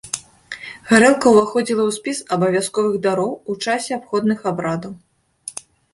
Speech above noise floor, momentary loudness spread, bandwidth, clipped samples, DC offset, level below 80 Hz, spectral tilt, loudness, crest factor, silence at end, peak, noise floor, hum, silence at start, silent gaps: 22 dB; 19 LU; 11.5 kHz; under 0.1%; under 0.1%; -58 dBFS; -4.5 dB/octave; -18 LUFS; 18 dB; 0.45 s; -2 dBFS; -39 dBFS; none; 0.05 s; none